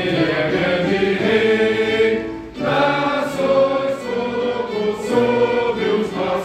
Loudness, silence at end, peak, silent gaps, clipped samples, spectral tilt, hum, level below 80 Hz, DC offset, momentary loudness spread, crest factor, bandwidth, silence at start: -18 LUFS; 0 s; -4 dBFS; none; under 0.1%; -6 dB/octave; none; -48 dBFS; under 0.1%; 6 LU; 14 dB; 13.5 kHz; 0 s